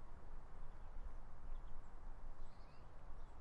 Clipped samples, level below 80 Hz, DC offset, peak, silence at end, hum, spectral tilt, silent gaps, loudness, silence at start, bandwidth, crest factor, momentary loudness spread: under 0.1%; -50 dBFS; under 0.1%; -36 dBFS; 0 s; none; -7 dB/octave; none; -60 LUFS; 0 s; 4.5 kHz; 10 dB; 4 LU